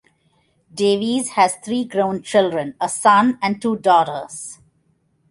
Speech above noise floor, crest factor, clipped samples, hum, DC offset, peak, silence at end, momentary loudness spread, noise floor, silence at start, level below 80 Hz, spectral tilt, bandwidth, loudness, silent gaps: 45 dB; 18 dB; under 0.1%; none; under 0.1%; -2 dBFS; 0.75 s; 14 LU; -63 dBFS; 0.75 s; -64 dBFS; -4 dB/octave; 11.5 kHz; -18 LUFS; none